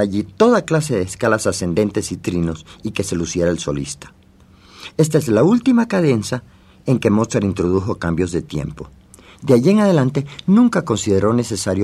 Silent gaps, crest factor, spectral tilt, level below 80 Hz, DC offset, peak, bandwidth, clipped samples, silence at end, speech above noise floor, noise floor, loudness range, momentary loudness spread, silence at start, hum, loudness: none; 16 dB; -6 dB/octave; -46 dBFS; under 0.1%; 0 dBFS; 13.5 kHz; under 0.1%; 0 s; 31 dB; -48 dBFS; 5 LU; 13 LU; 0 s; none; -17 LUFS